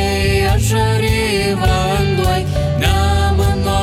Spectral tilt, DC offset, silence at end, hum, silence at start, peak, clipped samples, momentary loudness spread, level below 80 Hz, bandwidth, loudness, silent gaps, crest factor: -5.5 dB/octave; under 0.1%; 0 s; none; 0 s; -2 dBFS; under 0.1%; 2 LU; -22 dBFS; 16 kHz; -15 LUFS; none; 12 dB